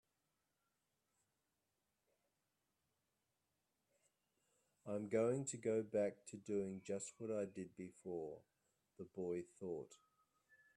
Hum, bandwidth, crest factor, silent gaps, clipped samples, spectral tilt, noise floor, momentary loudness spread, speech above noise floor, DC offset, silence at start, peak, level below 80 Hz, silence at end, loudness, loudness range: none; 11.5 kHz; 20 dB; none; under 0.1%; -6 dB/octave; -89 dBFS; 15 LU; 44 dB; under 0.1%; 4.85 s; -28 dBFS; -88 dBFS; 0.8 s; -45 LUFS; 8 LU